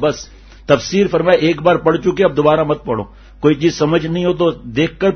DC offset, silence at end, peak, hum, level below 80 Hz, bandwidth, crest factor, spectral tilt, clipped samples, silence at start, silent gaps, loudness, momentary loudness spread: under 0.1%; 0 s; 0 dBFS; none; -40 dBFS; 6.6 kHz; 14 dB; -6 dB/octave; under 0.1%; 0 s; none; -15 LUFS; 8 LU